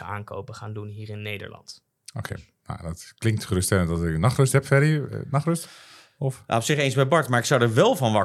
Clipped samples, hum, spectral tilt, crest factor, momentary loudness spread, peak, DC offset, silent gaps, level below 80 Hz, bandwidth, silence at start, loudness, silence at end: under 0.1%; none; -5.5 dB/octave; 20 dB; 18 LU; -4 dBFS; under 0.1%; none; -52 dBFS; 14.5 kHz; 0 s; -23 LUFS; 0 s